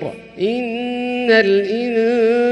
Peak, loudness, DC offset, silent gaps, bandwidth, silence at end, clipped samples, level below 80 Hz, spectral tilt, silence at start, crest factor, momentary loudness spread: -2 dBFS; -17 LUFS; under 0.1%; none; 9.2 kHz; 0 s; under 0.1%; -58 dBFS; -6 dB/octave; 0 s; 16 dB; 9 LU